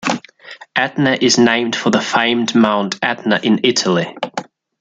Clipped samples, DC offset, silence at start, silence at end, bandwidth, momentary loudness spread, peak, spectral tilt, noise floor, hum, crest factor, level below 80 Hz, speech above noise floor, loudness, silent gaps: under 0.1%; under 0.1%; 0 s; 0.35 s; 9.2 kHz; 11 LU; 0 dBFS; -4 dB/octave; -39 dBFS; none; 16 dB; -60 dBFS; 24 dB; -15 LUFS; none